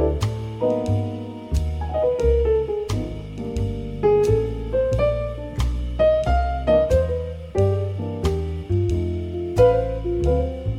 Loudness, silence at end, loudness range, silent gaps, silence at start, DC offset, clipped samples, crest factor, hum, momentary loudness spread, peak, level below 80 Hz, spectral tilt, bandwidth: -22 LUFS; 0 s; 2 LU; none; 0 s; under 0.1%; under 0.1%; 16 dB; none; 9 LU; -4 dBFS; -28 dBFS; -8 dB/octave; 12 kHz